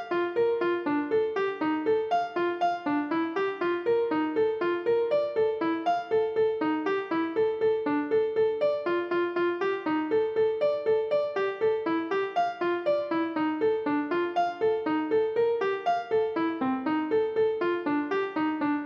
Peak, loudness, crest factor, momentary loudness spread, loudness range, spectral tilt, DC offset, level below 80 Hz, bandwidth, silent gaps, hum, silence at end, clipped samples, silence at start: -16 dBFS; -27 LUFS; 10 dB; 3 LU; 1 LU; -6.5 dB/octave; under 0.1%; -72 dBFS; 6.8 kHz; none; none; 0 s; under 0.1%; 0 s